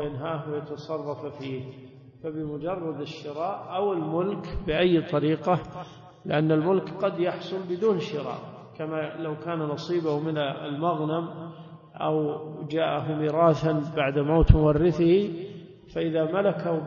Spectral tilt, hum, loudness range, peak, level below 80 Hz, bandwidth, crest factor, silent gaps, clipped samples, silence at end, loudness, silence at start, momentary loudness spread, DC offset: -8.5 dB/octave; none; 8 LU; 0 dBFS; -38 dBFS; 7.2 kHz; 26 dB; none; under 0.1%; 0 s; -27 LUFS; 0 s; 15 LU; under 0.1%